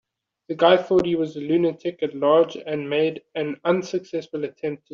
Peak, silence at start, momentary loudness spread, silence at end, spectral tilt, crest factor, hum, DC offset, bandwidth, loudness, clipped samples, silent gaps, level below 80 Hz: -4 dBFS; 0.5 s; 11 LU; 0.15 s; -4.5 dB/octave; 20 dB; none; under 0.1%; 7.2 kHz; -22 LUFS; under 0.1%; none; -64 dBFS